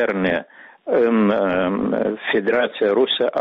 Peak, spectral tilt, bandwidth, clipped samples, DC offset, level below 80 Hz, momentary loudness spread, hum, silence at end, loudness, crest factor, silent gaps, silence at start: -6 dBFS; -3.5 dB/octave; 5.4 kHz; under 0.1%; under 0.1%; -54 dBFS; 5 LU; none; 0 s; -19 LUFS; 12 dB; none; 0 s